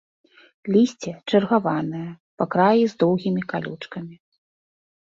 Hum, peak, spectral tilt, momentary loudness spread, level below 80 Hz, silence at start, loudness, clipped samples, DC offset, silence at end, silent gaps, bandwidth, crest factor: none; -4 dBFS; -7 dB/octave; 17 LU; -66 dBFS; 0.65 s; -22 LUFS; under 0.1%; under 0.1%; 1 s; 2.20-2.37 s; 7.6 kHz; 18 dB